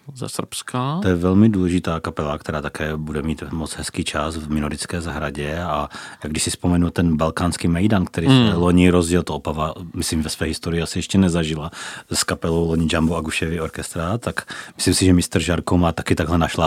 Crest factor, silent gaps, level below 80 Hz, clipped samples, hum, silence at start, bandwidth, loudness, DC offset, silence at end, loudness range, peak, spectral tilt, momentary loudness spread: 20 dB; none; -36 dBFS; under 0.1%; none; 0.05 s; 16 kHz; -20 LUFS; under 0.1%; 0 s; 7 LU; 0 dBFS; -5.5 dB/octave; 11 LU